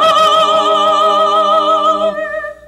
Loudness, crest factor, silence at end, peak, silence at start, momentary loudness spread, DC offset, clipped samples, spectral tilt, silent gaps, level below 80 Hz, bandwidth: -11 LUFS; 10 dB; 0.15 s; 0 dBFS; 0 s; 7 LU; under 0.1%; under 0.1%; -2.5 dB/octave; none; -50 dBFS; 15 kHz